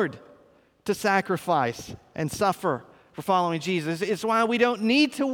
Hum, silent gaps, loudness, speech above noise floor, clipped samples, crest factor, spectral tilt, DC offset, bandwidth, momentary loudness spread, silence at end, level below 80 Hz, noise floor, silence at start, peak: none; none; -25 LUFS; 34 dB; under 0.1%; 18 dB; -5 dB/octave; under 0.1%; 19.5 kHz; 13 LU; 0 s; -62 dBFS; -59 dBFS; 0 s; -8 dBFS